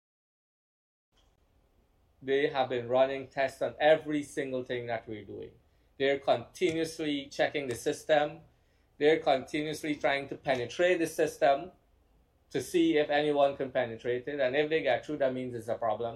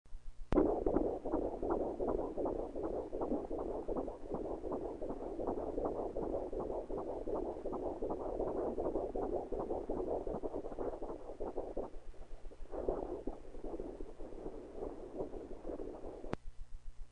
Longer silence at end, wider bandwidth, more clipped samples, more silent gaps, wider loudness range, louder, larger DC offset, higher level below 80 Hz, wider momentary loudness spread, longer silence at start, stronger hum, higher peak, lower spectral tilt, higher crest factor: about the same, 0 s vs 0 s; first, 14 kHz vs 9.8 kHz; neither; neither; second, 3 LU vs 8 LU; first, -30 LUFS vs -41 LUFS; neither; second, -66 dBFS vs -50 dBFS; second, 9 LU vs 12 LU; first, 2.2 s vs 0.05 s; neither; first, -12 dBFS vs -18 dBFS; second, -4.5 dB/octave vs -9 dB/octave; about the same, 20 dB vs 22 dB